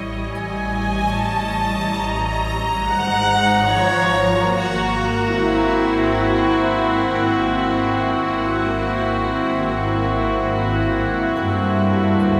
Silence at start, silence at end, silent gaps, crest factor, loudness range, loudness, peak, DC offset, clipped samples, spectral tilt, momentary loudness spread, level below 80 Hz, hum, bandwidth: 0 s; 0 s; none; 14 dB; 3 LU; -19 LUFS; -4 dBFS; under 0.1%; under 0.1%; -6 dB/octave; 5 LU; -32 dBFS; none; 13.5 kHz